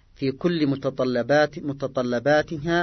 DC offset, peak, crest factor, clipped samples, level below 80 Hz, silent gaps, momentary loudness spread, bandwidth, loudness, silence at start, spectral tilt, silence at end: under 0.1%; -8 dBFS; 16 dB; under 0.1%; -54 dBFS; none; 7 LU; 6.4 kHz; -23 LUFS; 0.2 s; -6.5 dB/octave; 0 s